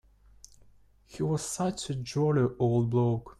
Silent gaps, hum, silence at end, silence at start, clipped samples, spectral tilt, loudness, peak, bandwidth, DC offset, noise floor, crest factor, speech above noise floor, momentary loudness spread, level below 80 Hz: none; none; 0.1 s; 1.1 s; under 0.1%; -6.5 dB/octave; -29 LUFS; -16 dBFS; 13 kHz; under 0.1%; -59 dBFS; 14 dB; 31 dB; 8 LU; -56 dBFS